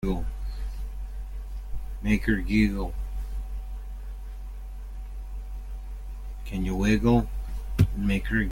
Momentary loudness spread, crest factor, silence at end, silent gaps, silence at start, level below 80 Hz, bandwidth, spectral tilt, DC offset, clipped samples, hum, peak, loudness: 17 LU; 22 dB; 0 s; none; 0 s; -32 dBFS; 16.5 kHz; -7 dB/octave; under 0.1%; under 0.1%; none; -6 dBFS; -28 LUFS